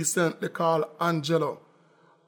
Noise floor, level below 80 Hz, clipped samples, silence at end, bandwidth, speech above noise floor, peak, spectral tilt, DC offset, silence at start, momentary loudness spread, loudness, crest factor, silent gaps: -60 dBFS; -74 dBFS; under 0.1%; 0.7 s; 18 kHz; 34 dB; -12 dBFS; -4.5 dB/octave; under 0.1%; 0 s; 5 LU; -27 LUFS; 16 dB; none